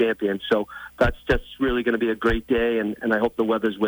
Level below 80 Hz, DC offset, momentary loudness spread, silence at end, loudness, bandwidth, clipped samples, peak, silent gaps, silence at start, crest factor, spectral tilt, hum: -36 dBFS; under 0.1%; 3 LU; 0 s; -23 LUFS; over 20 kHz; under 0.1%; -8 dBFS; none; 0 s; 14 dB; -7 dB/octave; none